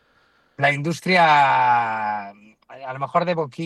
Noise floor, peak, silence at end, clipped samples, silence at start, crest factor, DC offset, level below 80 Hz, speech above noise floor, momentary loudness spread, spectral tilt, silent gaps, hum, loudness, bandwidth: -61 dBFS; -4 dBFS; 0 s; under 0.1%; 0.6 s; 16 dB; under 0.1%; -68 dBFS; 41 dB; 17 LU; -5 dB/octave; none; none; -19 LUFS; 12.5 kHz